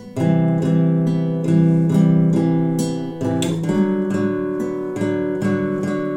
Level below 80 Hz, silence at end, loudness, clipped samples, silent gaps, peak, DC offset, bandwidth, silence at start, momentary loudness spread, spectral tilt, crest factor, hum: -56 dBFS; 0 s; -19 LUFS; under 0.1%; none; -6 dBFS; under 0.1%; 11 kHz; 0 s; 8 LU; -8 dB/octave; 12 dB; none